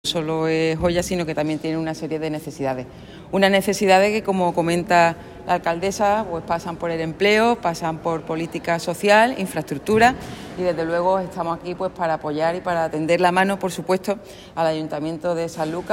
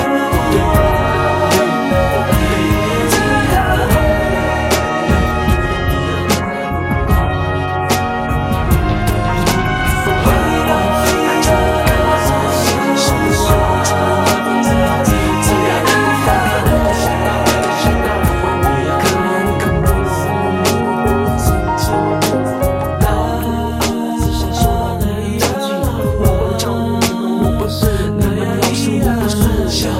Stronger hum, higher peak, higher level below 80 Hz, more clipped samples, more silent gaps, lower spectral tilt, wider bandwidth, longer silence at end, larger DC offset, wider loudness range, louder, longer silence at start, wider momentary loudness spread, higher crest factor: neither; about the same, -2 dBFS vs 0 dBFS; second, -48 dBFS vs -22 dBFS; neither; neither; about the same, -5 dB/octave vs -5 dB/octave; about the same, 16.5 kHz vs 16.5 kHz; about the same, 0 s vs 0 s; neither; about the same, 3 LU vs 3 LU; second, -21 LUFS vs -14 LUFS; about the same, 0.05 s vs 0 s; first, 10 LU vs 4 LU; first, 20 dB vs 14 dB